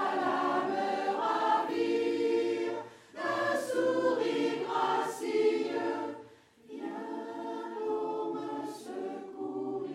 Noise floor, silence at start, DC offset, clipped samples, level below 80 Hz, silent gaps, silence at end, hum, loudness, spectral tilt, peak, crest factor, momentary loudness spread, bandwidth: -55 dBFS; 0 s; under 0.1%; under 0.1%; -84 dBFS; none; 0 s; none; -32 LUFS; -4.5 dB/octave; -16 dBFS; 16 dB; 11 LU; 15 kHz